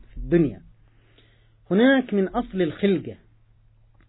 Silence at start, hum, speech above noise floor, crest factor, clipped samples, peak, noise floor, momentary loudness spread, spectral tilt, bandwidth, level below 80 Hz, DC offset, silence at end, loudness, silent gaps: 0.15 s; none; 35 dB; 18 dB; under 0.1%; -8 dBFS; -56 dBFS; 9 LU; -11 dB/octave; 4.1 kHz; -46 dBFS; under 0.1%; 0.95 s; -22 LUFS; none